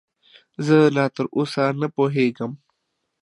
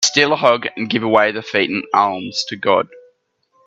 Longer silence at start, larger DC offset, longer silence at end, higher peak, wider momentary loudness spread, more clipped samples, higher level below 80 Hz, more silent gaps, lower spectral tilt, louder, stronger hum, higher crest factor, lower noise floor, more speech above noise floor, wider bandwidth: first, 0.6 s vs 0 s; neither; about the same, 0.65 s vs 0.7 s; second, -4 dBFS vs 0 dBFS; first, 15 LU vs 7 LU; neither; second, -72 dBFS vs -62 dBFS; neither; first, -7 dB/octave vs -2.5 dB/octave; second, -20 LUFS vs -17 LUFS; neither; about the same, 18 dB vs 18 dB; first, -76 dBFS vs -62 dBFS; first, 56 dB vs 45 dB; first, 11.5 kHz vs 10 kHz